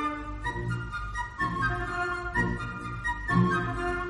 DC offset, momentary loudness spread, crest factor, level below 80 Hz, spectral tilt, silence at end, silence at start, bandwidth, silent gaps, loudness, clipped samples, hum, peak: under 0.1%; 9 LU; 18 dB; -40 dBFS; -6.5 dB/octave; 0 s; 0 s; 11.5 kHz; none; -30 LUFS; under 0.1%; none; -12 dBFS